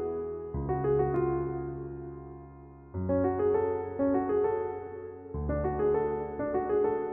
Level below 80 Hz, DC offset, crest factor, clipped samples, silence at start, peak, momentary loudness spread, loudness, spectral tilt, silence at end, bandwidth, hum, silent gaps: -46 dBFS; under 0.1%; 14 dB; under 0.1%; 0 s; -16 dBFS; 15 LU; -30 LUFS; -10 dB/octave; 0 s; 3.1 kHz; none; none